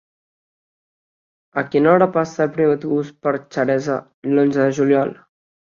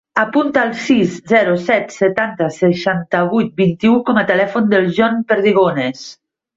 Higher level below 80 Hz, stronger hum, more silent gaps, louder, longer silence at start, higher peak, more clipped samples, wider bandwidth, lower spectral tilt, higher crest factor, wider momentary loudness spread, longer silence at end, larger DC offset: second, -64 dBFS vs -56 dBFS; neither; first, 4.14-4.22 s vs none; second, -18 LUFS vs -15 LUFS; first, 1.55 s vs 0.15 s; about the same, -2 dBFS vs 0 dBFS; neither; about the same, 7.4 kHz vs 7.8 kHz; about the same, -7.5 dB/octave vs -6.5 dB/octave; about the same, 16 dB vs 14 dB; first, 10 LU vs 5 LU; first, 0.6 s vs 0.45 s; neither